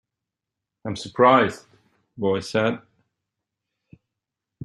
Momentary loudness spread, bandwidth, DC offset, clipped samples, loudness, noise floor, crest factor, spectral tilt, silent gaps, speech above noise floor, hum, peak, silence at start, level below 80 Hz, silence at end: 20 LU; 12 kHz; under 0.1%; under 0.1%; -21 LUFS; -86 dBFS; 22 dB; -5.5 dB/octave; none; 65 dB; none; -2 dBFS; 0.85 s; -64 dBFS; 1.85 s